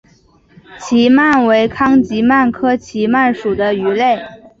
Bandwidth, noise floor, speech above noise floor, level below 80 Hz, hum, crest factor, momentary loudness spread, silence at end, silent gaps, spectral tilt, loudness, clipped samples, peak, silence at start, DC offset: 7.6 kHz; -50 dBFS; 37 dB; -48 dBFS; none; 12 dB; 7 LU; 0.25 s; none; -5.5 dB/octave; -13 LUFS; under 0.1%; -2 dBFS; 0.7 s; under 0.1%